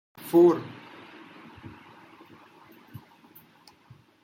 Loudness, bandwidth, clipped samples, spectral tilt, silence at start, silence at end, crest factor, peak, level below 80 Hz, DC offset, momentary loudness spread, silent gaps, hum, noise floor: -22 LUFS; 16.5 kHz; under 0.1%; -7.5 dB/octave; 0.25 s; 3.55 s; 20 dB; -10 dBFS; -72 dBFS; under 0.1%; 29 LU; none; none; -57 dBFS